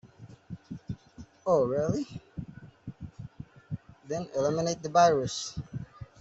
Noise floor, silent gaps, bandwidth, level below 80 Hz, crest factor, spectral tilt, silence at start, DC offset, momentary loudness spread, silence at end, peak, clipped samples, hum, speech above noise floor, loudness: -52 dBFS; none; 8.2 kHz; -58 dBFS; 22 dB; -5.5 dB/octave; 0.05 s; under 0.1%; 23 LU; 0.15 s; -8 dBFS; under 0.1%; none; 25 dB; -28 LUFS